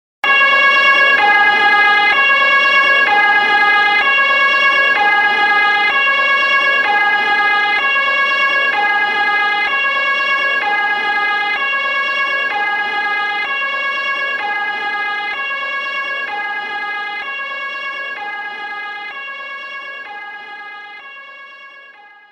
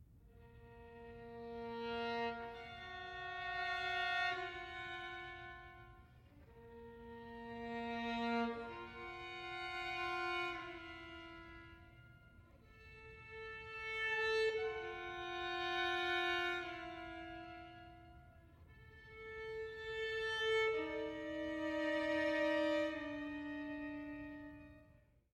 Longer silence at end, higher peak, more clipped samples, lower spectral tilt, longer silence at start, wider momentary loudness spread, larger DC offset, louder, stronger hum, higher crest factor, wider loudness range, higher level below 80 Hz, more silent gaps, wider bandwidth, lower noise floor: about the same, 0.4 s vs 0.35 s; first, -2 dBFS vs -26 dBFS; neither; second, -1 dB/octave vs -4.5 dB/octave; first, 0.25 s vs 0 s; second, 16 LU vs 21 LU; neither; first, -13 LUFS vs -41 LUFS; neither; about the same, 14 dB vs 18 dB; first, 14 LU vs 10 LU; about the same, -62 dBFS vs -66 dBFS; neither; about the same, 13 kHz vs 13.5 kHz; second, -41 dBFS vs -68 dBFS